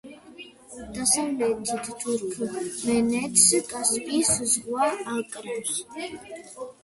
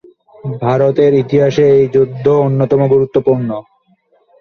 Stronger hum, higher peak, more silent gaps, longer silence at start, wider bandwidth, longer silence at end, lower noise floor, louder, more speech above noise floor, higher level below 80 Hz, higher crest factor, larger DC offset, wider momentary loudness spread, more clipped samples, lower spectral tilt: neither; second, -4 dBFS vs 0 dBFS; neither; second, 0.05 s vs 0.45 s; first, 12 kHz vs 6.6 kHz; second, 0.1 s vs 0.8 s; second, -46 dBFS vs -55 dBFS; second, -24 LUFS vs -12 LUFS; second, 20 dB vs 44 dB; second, -58 dBFS vs -50 dBFS; first, 22 dB vs 12 dB; neither; first, 21 LU vs 11 LU; neither; second, -2 dB/octave vs -8.5 dB/octave